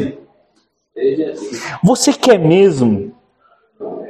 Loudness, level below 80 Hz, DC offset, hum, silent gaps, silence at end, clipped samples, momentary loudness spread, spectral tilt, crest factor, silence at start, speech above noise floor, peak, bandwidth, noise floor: -14 LUFS; -54 dBFS; under 0.1%; none; none; 0 s; under 0.1%; 17 LU; -5.5 dB/octave; 16 dB; 0 s; 48 dB; 0 dBFS; 14 kHz; -61 dBFS